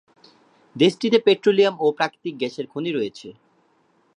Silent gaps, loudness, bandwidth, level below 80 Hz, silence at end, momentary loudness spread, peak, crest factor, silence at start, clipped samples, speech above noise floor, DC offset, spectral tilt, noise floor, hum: none; -21 LUFS; 10.5 kHz; -74 dBFS; 0.85 s; 12 LU; -2 dBFS; 20 dB; 0.75 s; under 0.1%; 42 dB; under 0.1%; -5.5 dB/octave; -62 dBFS; none